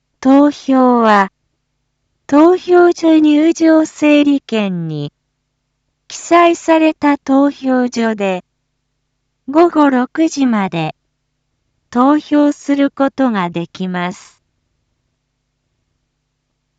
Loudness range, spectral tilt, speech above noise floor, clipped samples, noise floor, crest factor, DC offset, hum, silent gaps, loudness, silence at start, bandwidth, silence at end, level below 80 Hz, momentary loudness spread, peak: 6 LU; -6 dB/octave; 57 dB; under 0.1%; -69 dBFS; 14 dB; under 0.1%; none; none; -13 LUFS; 0.2 s; 8 kHz; 2.65 s; -60 dBFS; 11 LU; 0 dBFS